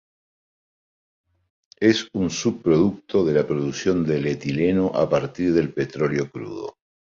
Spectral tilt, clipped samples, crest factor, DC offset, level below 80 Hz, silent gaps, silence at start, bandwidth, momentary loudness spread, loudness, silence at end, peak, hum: -6 dB/octave; under 0.1%; 18 dB; under 0.1%; -52 dBFS; none; 1.8 s; 7.6 kHz; 7 LU; -22 LUFS; 0.4 s; -4 dBFS; none